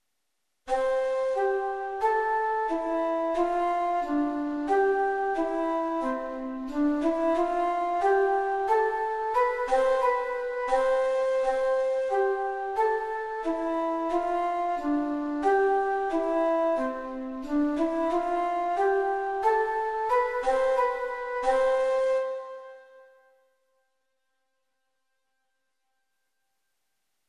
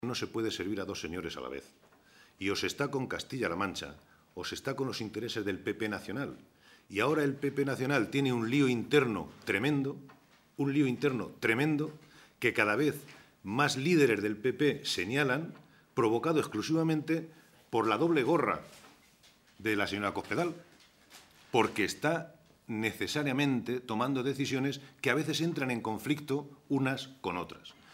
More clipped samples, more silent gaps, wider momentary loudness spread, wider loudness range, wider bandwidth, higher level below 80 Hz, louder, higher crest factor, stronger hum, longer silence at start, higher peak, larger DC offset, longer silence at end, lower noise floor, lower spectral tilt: neither; neither; second, 6 LU vs 11 LU; second, 2 LU vs 6 LU; second, 11 kHz vs 16 kHz; first, -60 dBFS vs -68 dBFS; first, -27 LUFS vs -32 LUFS; second, 16 dB vs 22 dB; neither; first, 0.65 s vs 0 s; about the same, -12 dBFS vs -10 dBFS; neither; first, 4.25 s vs 0 s; first, -81 dBFS vs -63 dBFS; about the same, -4.5 dB/octave vs -5.5 dB/octave